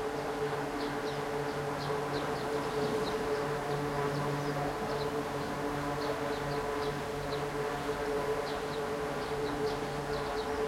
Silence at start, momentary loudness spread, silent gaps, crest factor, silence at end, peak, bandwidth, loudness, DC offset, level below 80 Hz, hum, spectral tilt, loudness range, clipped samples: 0 s; 2 LU; none; 14 dB; 0 s; -20 dBFS; 16.5 kHz; -34 LUFS; under 0.1%; -54 dBFS; none; -5 dB/octave; 1 LU; under 0.1%